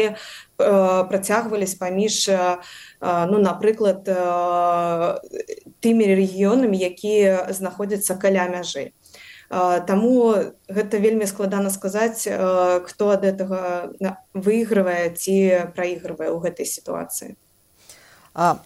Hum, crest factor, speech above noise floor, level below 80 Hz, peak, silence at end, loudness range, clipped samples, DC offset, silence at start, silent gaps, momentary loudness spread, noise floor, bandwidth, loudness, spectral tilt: none; 16 dB; 31 dB; -64 dBFS; -6 dBFS; 0.05 s; 2 LU; under 0.1%; under 0.1%; 0 s; none; 10 LU; -51 dBFS; 16 kHz; -21 LUFS; -5 dB/octave